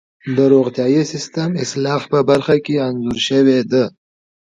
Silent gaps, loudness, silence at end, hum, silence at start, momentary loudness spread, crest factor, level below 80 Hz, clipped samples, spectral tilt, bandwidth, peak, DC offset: none; -16 LUFS; 0.5 s; none; 0.25 s; 8 LU; 16 dB; -54 dBFS; under 0.1%; -6 dB/octave; 9.2 kHz; 0 dBFS; under 0.1%